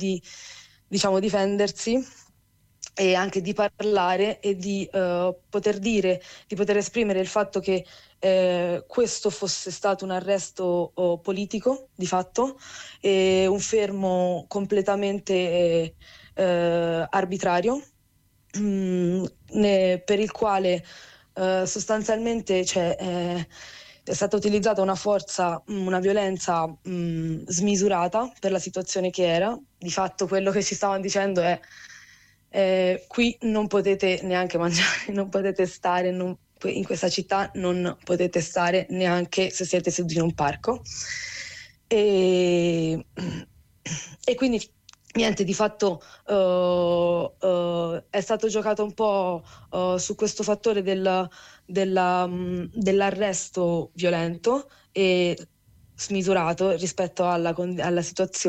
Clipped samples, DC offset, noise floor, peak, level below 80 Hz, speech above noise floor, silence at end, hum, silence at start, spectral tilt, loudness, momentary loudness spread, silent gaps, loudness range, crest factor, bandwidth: under 0.1%; under 0.1%; -63 dBFS; -10 dBFS; -56 dBFS; 39 dB; 0 s; none; 0 s; -4.5 dB/octave; -25 LUFS; 9 LU; none; 2 LU; 14 dB; 9.6 kHz